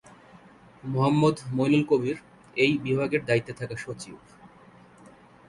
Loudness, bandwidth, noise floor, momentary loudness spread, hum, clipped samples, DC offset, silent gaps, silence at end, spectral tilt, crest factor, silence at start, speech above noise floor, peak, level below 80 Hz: -25 LUFS; 11.5 kHz; -53 dBFS; 16 LU; none; under 0.1%; under 0.1%; none; 1 s; -6.5 dB/octave; 20 dB; 0.85 s; 28 dB; -8 dBFS; -60 dBFS